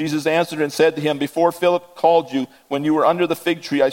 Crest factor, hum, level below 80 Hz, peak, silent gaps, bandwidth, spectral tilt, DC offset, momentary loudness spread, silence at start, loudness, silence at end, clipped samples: 16 dB; none; -68 dBFS; -2 dBFS; none; 17 kHz; -5 dB/octave; under 0.1%; 6 LU; 0 s; -19 LUFS; 0 s; under 0.1%